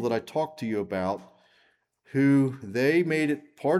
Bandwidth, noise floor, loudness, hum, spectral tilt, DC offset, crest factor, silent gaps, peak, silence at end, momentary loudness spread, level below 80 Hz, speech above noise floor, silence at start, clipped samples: 13 kHz; -67 dBFS; -26 LUFS; none; -7 dB/octave; under 0.1%; 14 dB; none; -12 dBFS; 0 s; 9 LU; -72 dBFS; 41 dB; 0 s; under 0.1%